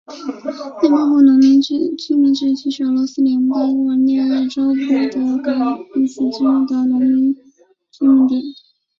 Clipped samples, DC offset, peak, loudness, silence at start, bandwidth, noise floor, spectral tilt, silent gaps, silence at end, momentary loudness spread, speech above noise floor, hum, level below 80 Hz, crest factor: under 0.1%; under 0.1%; -2 dBFS; -15 LUFS; 0.1 s; 7.2 kHz; -52 dBFS; -5 dB/octave; none; 0.45 s; 9 LU; 37 dB; none; -62 dBFS; 12 dB